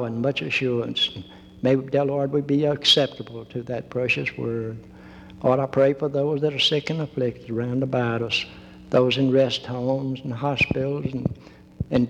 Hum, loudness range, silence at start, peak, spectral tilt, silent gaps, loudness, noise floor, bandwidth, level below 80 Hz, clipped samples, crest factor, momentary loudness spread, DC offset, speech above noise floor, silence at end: none; 2 LU; 0 s; -6 dBFS; -5.5 dB/octave; none; -23 LUFS; -43 dBFS; 12 kHz; -52 dBFS; under 0.1%; 16 dB; 11 LU; under 0.1%; 20 dB; 0 s